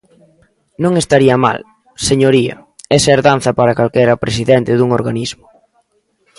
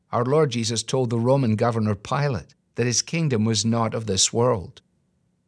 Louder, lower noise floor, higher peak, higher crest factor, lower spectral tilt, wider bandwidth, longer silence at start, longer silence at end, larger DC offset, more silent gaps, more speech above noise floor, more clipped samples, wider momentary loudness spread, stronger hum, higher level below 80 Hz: first, -13 LUFS vs -22 LUFS; second, -59 dBFS vs -68 dBFS; first, 0 dBFS vs -6 dBFS; about the same, 14 dB vs 16 dB; about the same, -5 dB/octave vs -4.5 dB/octave; about the same, 11.5 kHz vs 11 kHz; first, 0.8 s vs 0.1 s; first, 1.05 s vs 0.75 s; neither; neither; about the same, 48 dB vs 46 dB; neither; first, 10 LU vs 7 LU; neither; first, -44 dBFS vs -56 dBFS